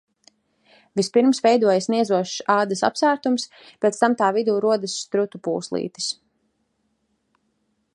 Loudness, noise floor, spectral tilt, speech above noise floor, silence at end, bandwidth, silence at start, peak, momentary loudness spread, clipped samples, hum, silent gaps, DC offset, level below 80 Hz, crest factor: -21 LUFS; -71 dBFS; -4 dB/octave; 50 dB; 1.8 s; 11.5 kHz; 0.95 s; -2 dBFS; 10 LU; under 0.1%; none; none; under 0.1%; -72 dBFS; 20 dB